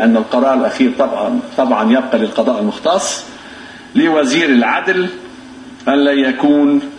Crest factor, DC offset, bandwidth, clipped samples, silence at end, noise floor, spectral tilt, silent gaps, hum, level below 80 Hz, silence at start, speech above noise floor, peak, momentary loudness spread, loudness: 14 dB; under 0.1%; 10 kHz; under 0.1%; 0 s; -34 dBFS; -4 dB/octave; none; none; -56 dBFS; 0 s; 21 dB; 0 dBFS; 20 LU; -14 LUFS